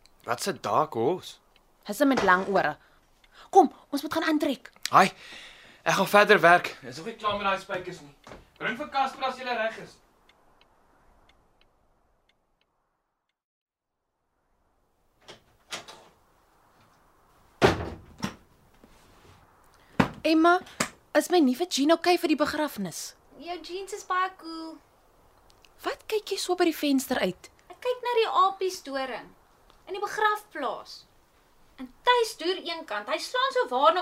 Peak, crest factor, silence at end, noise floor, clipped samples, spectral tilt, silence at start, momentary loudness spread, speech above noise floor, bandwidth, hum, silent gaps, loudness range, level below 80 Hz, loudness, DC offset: -4 dBFS; 24 dB; 0 s; -83 dBFS; under 0.1%; -4 dB/octave; 0.25 s; 18 LU; 57 dB; 16 kHz; none; 13.44-13.66 s; 12 LU; -58 dBFS; -26 LUFS; under 0.1%